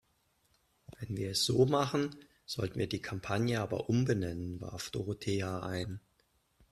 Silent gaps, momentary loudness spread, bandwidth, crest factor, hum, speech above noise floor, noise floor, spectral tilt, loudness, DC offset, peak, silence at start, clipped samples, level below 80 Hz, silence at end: none; 13 LU; 14 kHz; 22 dB; none; 41 dB; -74 dBFS; -5.5 dB/octave; -34 LUFS; under 0.1%; -14 dBFS; 0.9 s; under 0.1%; -62 dBFS; 0.75 s